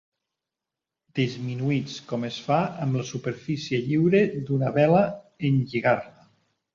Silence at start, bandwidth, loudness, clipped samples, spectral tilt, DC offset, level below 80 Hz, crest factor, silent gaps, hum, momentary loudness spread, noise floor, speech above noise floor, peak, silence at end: 1.15 s; 7.4 kHz; -25 LUFS; under 0.1%; -7 dB/octave; under 0.1%; -62 dBFS; 18 dB; none; none; 11 LU; -88 dBFS; 64 dB; -8 dBFS; 0.65 s